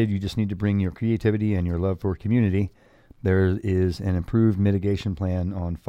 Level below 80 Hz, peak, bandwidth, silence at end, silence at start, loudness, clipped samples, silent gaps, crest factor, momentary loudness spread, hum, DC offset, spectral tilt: -42 dBFS; -8 dBFS; 8.4 kHz; 0.1 s; 0 s; -24 LUFS; under 0.1%; none; 16 dB; 6 LU; none; under 0.1%; -9 dB/octave